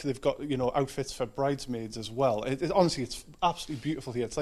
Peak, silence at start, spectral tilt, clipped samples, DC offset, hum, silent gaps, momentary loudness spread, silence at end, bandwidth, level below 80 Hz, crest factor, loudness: -10 dBFS; 0 s; -5.5 dB/octave; under 0.1%; under 0.1%; none; none; 9 LU; 0 s; 14 kHz; -52 dBFS; 20 dB; -31 LUFS